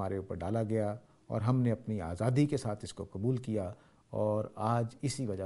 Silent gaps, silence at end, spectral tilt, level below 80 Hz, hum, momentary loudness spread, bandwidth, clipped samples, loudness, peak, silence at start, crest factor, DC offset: none; 0 s; -7.5 dB/octave; -60 dBFS; none; 10 LU; 11.5 kHz; under 0.1%; -34 LUFS; -14 dBFS; 0 s; 18 dB; under 0.1%